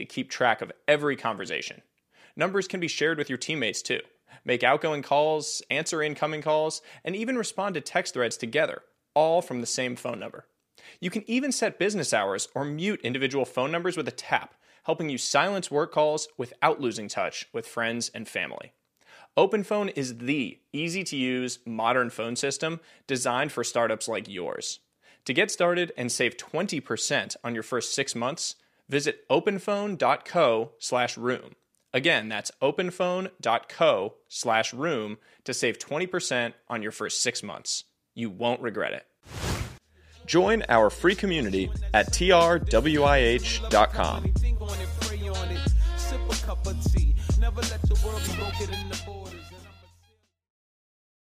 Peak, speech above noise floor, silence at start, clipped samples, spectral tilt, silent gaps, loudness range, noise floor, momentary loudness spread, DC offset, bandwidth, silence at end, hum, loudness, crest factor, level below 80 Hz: -4 dBFS; 39 dB; 0 s; under 0.1%; -4 dB/octave; none; 6 LU; -66 dBFS; 10 LU; under 0.1%; 15.5 kHz; 1.5 s; none; -27 LUFS; 24 dB; -36 dBFS